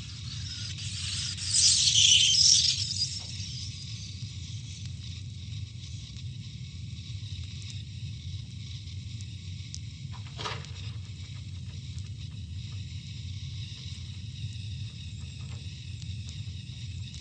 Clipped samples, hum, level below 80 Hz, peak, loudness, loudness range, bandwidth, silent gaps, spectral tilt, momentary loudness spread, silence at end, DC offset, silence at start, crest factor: under 0.1%; none; -50 dBFS; -8 dBFS; -26 LUFS; 18 LU; 9.6 kHz; none; -1 dB/octave; 21 LU; 0 s; under 0.1%; 0 s; 24 dB